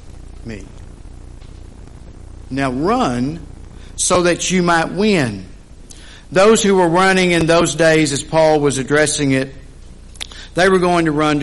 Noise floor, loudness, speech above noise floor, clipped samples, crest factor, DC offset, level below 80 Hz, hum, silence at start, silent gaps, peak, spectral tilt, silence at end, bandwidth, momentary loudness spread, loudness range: -37 dBFS; -15 LUFS; 23 dB; under 0.1%; 14 dB; under 0.1%; -38 dBFS; none; 0.05 s; none; -2 dBFS; -4.5 dB/octave; 0 s; 11.5 kHz; 19 LU; 10 LU